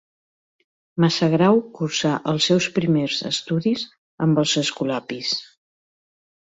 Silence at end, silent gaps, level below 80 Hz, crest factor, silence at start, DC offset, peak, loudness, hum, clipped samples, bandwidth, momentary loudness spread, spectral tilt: 1.05 s; 3.98-4.18 s; -62 dBFS; 18 dB; 0.95 s; under 0.1%; -4 dBFS; -21 LUFS; none; under 0.1%; 8 kHz; 8 LU; -5 dB/octave